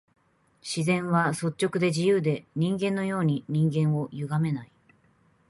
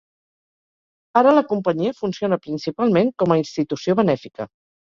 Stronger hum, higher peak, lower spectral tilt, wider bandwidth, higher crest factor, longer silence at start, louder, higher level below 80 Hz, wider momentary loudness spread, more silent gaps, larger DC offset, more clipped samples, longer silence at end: neither; second, -12 dBFS vs -2 dBFS; about the same, -6.5 dB/octave vs -7 dB/octave; first, 11.5 kHz vs 7.4 kHz; about the same, 16 dB vs 18 dB; second, 0.65 s vs 1.15 s; second, -26 LUFS vs -20 LUFS; second, -66 dBFS vs -60 dBFS; second, 6 LU vs 11 LU; neither; neither; neither; first, 0.85 s vs 0.4 s